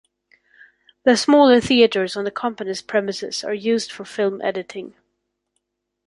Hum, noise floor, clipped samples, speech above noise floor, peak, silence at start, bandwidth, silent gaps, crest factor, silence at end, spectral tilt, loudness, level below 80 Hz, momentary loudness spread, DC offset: 50 Hz at -50 dBFS; -75 dBFS; under 0.1%; 57 dB; -2 dBFS; 1.05 s; 11.5 kHz; none; 18 dB; 1.15 s; -4 dB/octave; -19 LUFS; -58 dBFS; 16 LU; under 0.1%